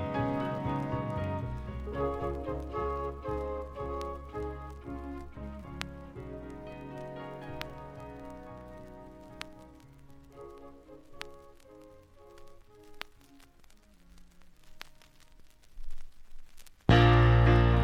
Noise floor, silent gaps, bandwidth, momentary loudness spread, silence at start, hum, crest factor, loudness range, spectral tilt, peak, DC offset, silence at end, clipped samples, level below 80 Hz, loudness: -57 dBFS; none; 8.6 kHz; 27 LU; 0 s; none; 24 dB; 21 LU; -7.5 dB/octave; -8 dBFS; under 0.1%; 0 s; under 0.1%; -40 dBFS; -31 LUFS